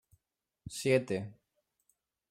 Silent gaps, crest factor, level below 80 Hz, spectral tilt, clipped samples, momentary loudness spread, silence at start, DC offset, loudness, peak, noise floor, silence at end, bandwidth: none; 22 dB; -70 dBFS; -5 dB/octave; under 0.1%; 19 LU; 0.65 s; under 0.1%; -32 LUFS; -16 dBFS; -85 dBFS; 1 s; 15.5 kHz